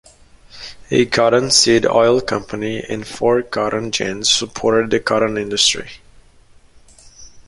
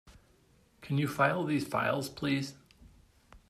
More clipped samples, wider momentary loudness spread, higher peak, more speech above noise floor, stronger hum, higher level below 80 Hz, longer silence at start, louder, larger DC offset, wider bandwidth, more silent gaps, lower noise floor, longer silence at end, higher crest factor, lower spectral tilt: neither; first, 13 LU vs 8 LU; first, 0 dBFS vs -14 dBFS; second, 31 dB vs 35 dB; neither; first, -48 dBFS vs -64 dBFS; first, 0.55 s vs 0.05 s; first, -16 LUFS vs -32 LUFS; neither; second, 11.5 kHz vs 15 kHz; neither; second, -47 dBFS vs -65 dBFS; about the same, 0.05 s vs 0.1 s; about the same, 18 dB vs 20 dB; second, -3 dB/octave vs -6 dB/octave